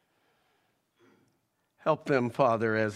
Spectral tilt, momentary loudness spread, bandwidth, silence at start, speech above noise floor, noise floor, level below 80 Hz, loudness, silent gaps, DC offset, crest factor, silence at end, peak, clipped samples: -7 dB/octave; 5 LU; 12.5 kHz; 1.85 s; 48 dB; -75 dBFS; -76 dBFS; -28 LUFS; none; under 0.1%; 20 dB; 0 s; -10 dBFS; under 0.1%